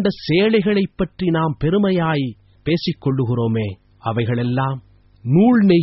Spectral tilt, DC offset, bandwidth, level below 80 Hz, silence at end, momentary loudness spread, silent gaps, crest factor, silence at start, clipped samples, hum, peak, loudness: -6.5 dB/octave; under 0.1%; 6 kHz; -46 dBFS; 0 s; 12 LU; none; 16 dB; 0 s; under 0.1%; none; -2 dBFS; -19 LUFS